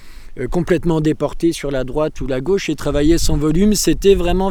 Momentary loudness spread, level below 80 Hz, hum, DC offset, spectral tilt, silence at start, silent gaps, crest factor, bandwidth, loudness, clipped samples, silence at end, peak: 8 LU; -24 dBFS; none; under 0.1%; -5.5 dB/octave; 0 s; none; 16 dB; 19 kHz; -17 LUFS; under 0.1%; 0 s; 0 dBFS